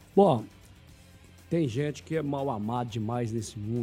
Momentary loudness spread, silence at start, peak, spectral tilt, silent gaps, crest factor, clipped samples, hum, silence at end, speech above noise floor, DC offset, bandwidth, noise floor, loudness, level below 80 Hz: 10 LU; 0 s; -8 dBFS; -7 dB/octave; none; 22 dB; under 0.1%; none; 0 s; 25 dB; under 0.1%; 15.5 kHz; -53 dBFS; -29 LUFS; -60 dBFS